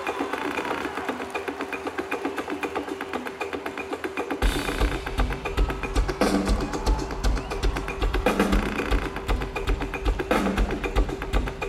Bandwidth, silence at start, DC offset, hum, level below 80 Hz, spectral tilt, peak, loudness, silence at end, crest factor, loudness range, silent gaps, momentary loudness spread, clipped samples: 15 kHz; 0 s; under 0.1%; none; -30 dBFS; -5.5 dB/octave; -8 dBFS; -27 LUFS; 0 s; 18 dB; 4 LU; none; 7 LU; under 0.1%